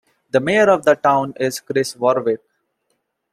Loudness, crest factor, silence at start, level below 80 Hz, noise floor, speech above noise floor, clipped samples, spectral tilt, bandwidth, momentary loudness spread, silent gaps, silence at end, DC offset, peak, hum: -18 LUFS; 16 dB; 0.35 s; -62 dBFS; -71 dBFS; 54 dB; under 0.1%; -4.5 dB/octave; 15 kHz; 9 LU; none; 0.95 s; under 0.1%; -2 dBFS; none